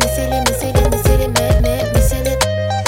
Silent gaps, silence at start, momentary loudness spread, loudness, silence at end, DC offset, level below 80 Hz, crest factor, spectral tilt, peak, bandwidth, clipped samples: none; 0 s; 2 LU; -15 LUFS; 0 s; under 0.1%; -18 dBFS; 14 dB; -4.5 dB/octave; 0 dBFS; 17 kHz; under 0.1%